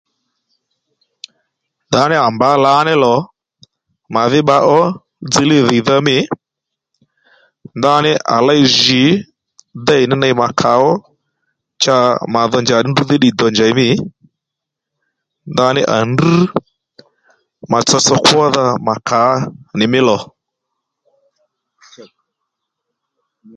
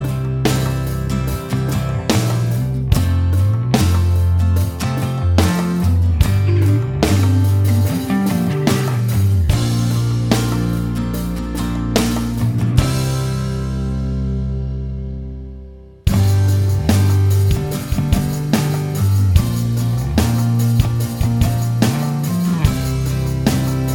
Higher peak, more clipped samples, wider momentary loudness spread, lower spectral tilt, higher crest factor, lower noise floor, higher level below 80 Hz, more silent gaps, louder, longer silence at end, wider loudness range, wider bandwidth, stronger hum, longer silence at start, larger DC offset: about the same, 0 dBFS vs 0 dBFS; neither; about the same, 9 LU vs 7 LU; second, -4.5 dB/octave vs -6.5 dB/octave; about the same, 14 dB vs 16 dB; first, -81 dBFS vs -36 dBFS; second, -54 dBFS vs -26 dBFS; neither; first, -12 LUFS vs -17 LUFS; first, 1.55 s vs 0 s; about the same, 4 LU vs 3 LU; second, 11.5 kHz vs 19.5 kHz; neither; first, 1.9 s vs 0 s; second, under 0.1% vs 0.2%